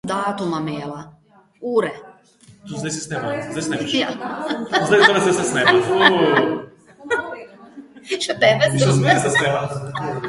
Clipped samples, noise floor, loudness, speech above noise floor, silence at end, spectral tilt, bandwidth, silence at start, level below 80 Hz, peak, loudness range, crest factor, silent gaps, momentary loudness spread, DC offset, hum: under 0.1%; -50 dBFS; -18 LUFS; 31 dB; 0 s; -4.5 dB/octave; 11.5 kHz; 0.05 s; -56 dBFS; 0 dBFS; 9 LU; 20 dB; none; 15 LU; under 0.1%; none